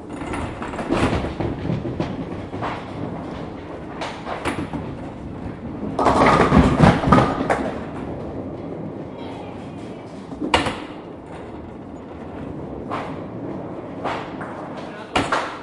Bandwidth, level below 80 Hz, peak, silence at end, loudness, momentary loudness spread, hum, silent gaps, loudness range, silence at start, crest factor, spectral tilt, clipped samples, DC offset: 11.5 kHz; -38 dBFS; 0 dBFS; 0 s; -23 LUFS; 19 LU; none; none; 13 LU; 0 s; 22 dB; -6.5 dB/octave; under 0.1%; under 0.1%